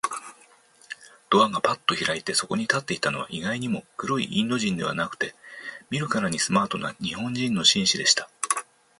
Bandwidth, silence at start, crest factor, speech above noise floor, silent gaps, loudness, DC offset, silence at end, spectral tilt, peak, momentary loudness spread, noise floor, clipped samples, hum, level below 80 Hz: 12 kHz; 0.05 s; 22 dB; 31 dB; none; -24 LUFS; under 0.1%; 0.4 s; -3 dB/octave; -4 dBFS; 12 LU; -56 dBFS; under 0.1%; none; -62 dBFS